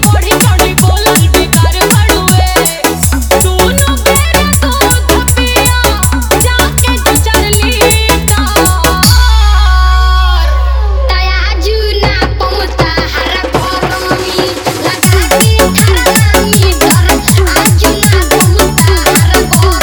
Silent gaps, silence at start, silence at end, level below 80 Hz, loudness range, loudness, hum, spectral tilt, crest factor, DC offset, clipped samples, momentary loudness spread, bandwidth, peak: none; 0 s; 0 s; -12 dBFS; 4 LU; -8 LUFS; none; -4 dB/octave; 8 dB; under 0.1%; 1%; 5 LU; over 20 kHz; 0 dBFS